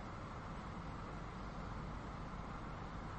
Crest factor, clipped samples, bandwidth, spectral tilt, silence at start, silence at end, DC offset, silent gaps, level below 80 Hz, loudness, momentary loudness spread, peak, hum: 12 dB; under 0.1%; 8.4 kHz; -6.5 dB/octave; 0 s; 0 s; under 0.1%; none; -52 dBFS; -48 LUFS; 1 LU; -36 dBFS; none